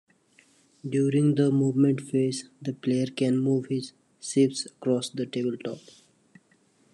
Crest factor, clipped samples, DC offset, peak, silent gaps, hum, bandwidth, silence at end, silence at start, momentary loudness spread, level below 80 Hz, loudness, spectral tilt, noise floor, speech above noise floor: 16 dB; under 0.1%; under 0.1%; -10 dBFS; none; none; 11 kHz; 1.15 s; 0.85 s; 13 LU; -74 dBFS; -26 LUFS; -6.5 dB/octave; -64 dBFS; 39 dB